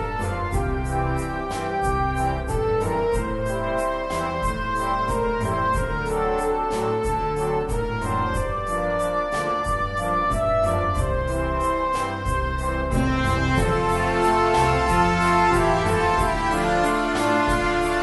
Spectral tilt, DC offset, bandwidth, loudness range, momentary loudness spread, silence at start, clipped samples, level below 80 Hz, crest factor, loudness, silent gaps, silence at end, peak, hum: -5.5 dB/octave; under 0.1%; 11.5 kHz; 5 LU; 6 LU; 0 s; under 0.1%; -32 dBFS; 16 dB; -23 LUFS; none; 0 s; -6 dBFS; none